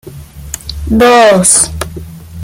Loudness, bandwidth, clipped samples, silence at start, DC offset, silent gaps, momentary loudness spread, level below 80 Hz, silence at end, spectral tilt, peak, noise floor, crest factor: -7 LUFS; over 20 kHz; 0.1%; 0.05 s; under 0.1%; none; 20 LU; -28 dBFS; 0 s; -3 dB/octave; 0 dBFS; -28 dBFS; 10 dB